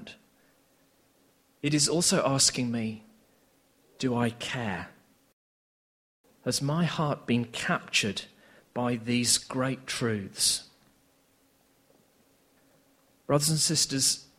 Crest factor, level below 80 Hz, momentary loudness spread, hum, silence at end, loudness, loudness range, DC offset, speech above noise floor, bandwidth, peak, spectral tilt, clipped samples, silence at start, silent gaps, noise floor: 22 dB; -64 dBFS; 14 LU; none; 0.15 s; -27 LUFS; 7 LU; under 0.1%; 38 dB; 16 kHz; -10 dBFS; -3 dB/octave; under 0.1%; 0 s; 5.33-6.24 s; -66 dBFS